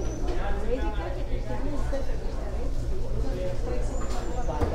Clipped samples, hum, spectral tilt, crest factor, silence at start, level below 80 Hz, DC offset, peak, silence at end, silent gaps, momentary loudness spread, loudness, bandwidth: under 0.1%; none; -6.5 dB/octave; 12 dB; 0 s; -28 dBFS; under 0.1%; -14 dBFS; 0 s; none; 3 LU; -32 LUFS; 9.2 kHz